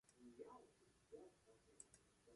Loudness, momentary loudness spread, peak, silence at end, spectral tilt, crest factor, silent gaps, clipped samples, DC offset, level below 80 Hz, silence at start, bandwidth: -65 LUFS; 5 LU; -42 dBFS; 0 s; -4 dB/octave; 24 dB; none; under 0.1%; under 0.1%; -86 dBFS; 0.05 s; 11.5 kHz